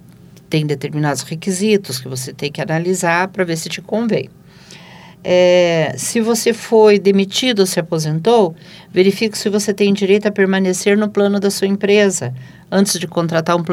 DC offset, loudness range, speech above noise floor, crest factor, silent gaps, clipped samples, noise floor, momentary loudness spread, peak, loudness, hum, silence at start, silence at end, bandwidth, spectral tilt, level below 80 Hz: under 0.1%; 5 LU; 27 dB; 16 dB; none; under 0.1%; -42 dBFS; 10 LU; 0 dBFS; -15 LUFS; none; 0.5 s; 0 s; 16 kHz; -4.5 dB/octave; -60 dBFS